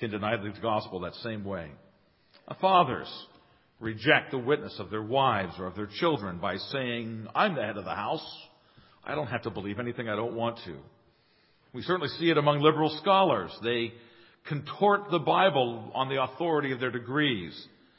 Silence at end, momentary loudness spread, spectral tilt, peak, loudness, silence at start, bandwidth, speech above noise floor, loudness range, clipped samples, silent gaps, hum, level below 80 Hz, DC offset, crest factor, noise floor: 0.3 s; 16 LU; -9.5 dB/octave; -4 dBFS; -28 LUFS; 0 s; 5.8 kHz; 37 dB; 7 LU; under 0.1%; none; none; -62 dBFS; under 0.1%; 24 dB; -65 dBFS